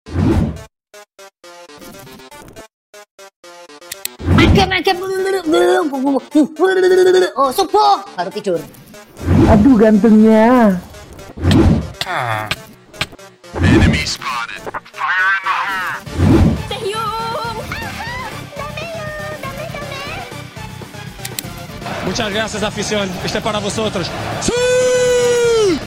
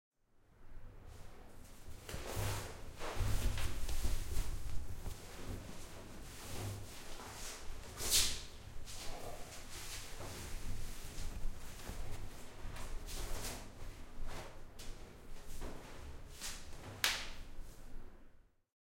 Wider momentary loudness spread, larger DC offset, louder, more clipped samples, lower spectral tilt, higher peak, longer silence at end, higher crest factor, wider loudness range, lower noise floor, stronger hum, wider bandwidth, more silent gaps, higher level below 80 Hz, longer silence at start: about the same, 19 LU vs 18 LU; neither; first, -15 LUFS vs -44 LUFS; neither; first, -5.5 dB/octave vs -2.5 dB/octave; first, -2 dBFS vs -14 dBFS; second, 0 s vs 0.4 s; second, 14 dB vs 26 dB; first, 13 LU vs 10 LU; second, -41 dBFS vs -67 dBFS; neither; about the same, 16.5 kHz vs 16.5 kHz; first, 2.73-2.93 s, 3.11-3.18 s, 3.36-3.43 s vs none; first, -30 dBFS vs -46 dBFS; second, 0.05 s vs 0.35 s